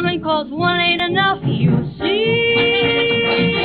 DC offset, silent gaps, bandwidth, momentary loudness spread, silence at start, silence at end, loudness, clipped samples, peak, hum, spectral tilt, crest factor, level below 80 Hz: under 0.1%; none; 5 kHz; 5 LU; 0 s; 0 s; -16 LUFS; under 0.1%; -4 dBFS; none; -9 dB/octave; 12 dB; -46 dBFS